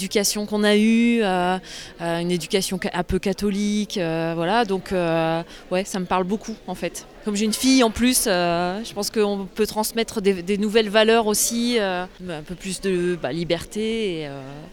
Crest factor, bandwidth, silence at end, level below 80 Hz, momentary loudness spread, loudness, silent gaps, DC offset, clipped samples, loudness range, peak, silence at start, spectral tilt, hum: 18 dB; 18.5 kHz; 0 s; -46 dBFS; 12 LU; -22 LUFS; none; under 0.1%; under 0.1%; 3 LU; -4 dBFS; 0 s; -4 dB/octave; none